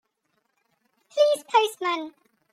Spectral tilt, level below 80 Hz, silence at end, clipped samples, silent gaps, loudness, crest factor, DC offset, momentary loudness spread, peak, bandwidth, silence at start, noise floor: -0.5 dB/octave; -88 dBFS; 0.45 s; under 0.1%; none; -24 LUFS; 20 dB; under 0.1%; 12 LU; -8 dBFS; 15.5 kHz; 1.15 s; -74 dBFS